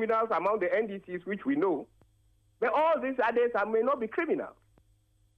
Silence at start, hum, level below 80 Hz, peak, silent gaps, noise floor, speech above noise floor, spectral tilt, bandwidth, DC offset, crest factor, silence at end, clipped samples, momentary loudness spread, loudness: 0 s; none; -70 dBFS; -16 dBFS; none; -67 dBFS; 38 dB; -7.5 dB/octave; 6 kHz; under 0.1%; 14 dB; 0.9 s; under 0.1%; 9 LU; -29 LUFS